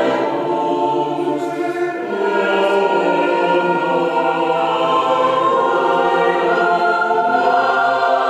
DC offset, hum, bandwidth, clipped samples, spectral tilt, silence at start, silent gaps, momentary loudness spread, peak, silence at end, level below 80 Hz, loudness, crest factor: under 0.1%; none; 12 kHz; under 0.1%; -5.5 dB/octave; 0 s; none; 5 LU; -4 dBFS; 0 s; -64 dBFS; -16 LUFS; 12 dB